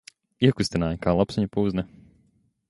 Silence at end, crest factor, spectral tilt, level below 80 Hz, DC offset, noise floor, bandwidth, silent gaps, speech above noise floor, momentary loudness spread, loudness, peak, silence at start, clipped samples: 0.85 s; 22 dB; -6.5 dB/octave; -46 dBFS; under 0.1%; -65 dBFS; 11.5 kHz; none; 42 dB; 6 LU; -24 LUFS; -4 dBFS; 0.4 s; under 0.1%